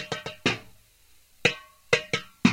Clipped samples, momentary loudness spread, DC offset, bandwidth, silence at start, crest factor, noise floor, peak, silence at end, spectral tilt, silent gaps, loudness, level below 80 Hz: under 0.1%; 10 LU; under 0.1%; 16 kHz; 0 s; 24 dB; -58 dBFS; -6 dBFS; 0 s; -4 dB/octave; none; -27 LUFS; -62 dBFS